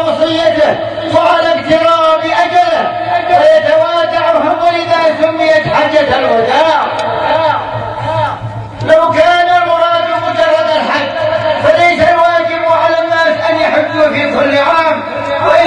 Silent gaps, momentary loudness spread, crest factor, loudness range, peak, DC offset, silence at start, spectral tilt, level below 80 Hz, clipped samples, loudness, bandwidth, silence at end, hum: none; 6 LU; 10 dB; 2 LU; 0 dBFS; under 0.1%; 0 s; -5 dB/octave; -44 dBFS; 0.2%; -10 LUFS; 10 kHz; 0 s; none